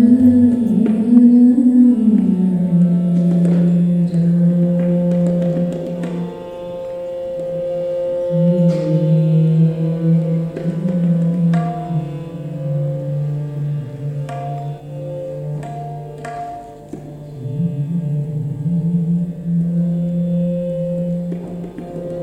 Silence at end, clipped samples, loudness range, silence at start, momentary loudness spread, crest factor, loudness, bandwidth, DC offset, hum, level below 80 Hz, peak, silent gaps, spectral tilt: 0 s; under 0.1%; 12 LU; 0 s; 16 LU; 16 dB; -17 LUFS; 4.2 kHz; under 0.1%; none; -50 dBFS; 0 dBFS; none; -10.5 dB/octave